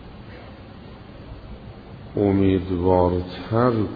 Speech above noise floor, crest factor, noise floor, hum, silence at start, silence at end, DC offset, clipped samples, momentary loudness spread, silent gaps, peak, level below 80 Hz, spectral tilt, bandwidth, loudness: 21 dB; 20 dB; -41 dBFS; none; 0 s; 0 s; under 0.1%; under 0.1%; 23 LU; none; -4 dBFS; -44 dBFS; -11 dB/octave; 5 kHz; -21 LUFS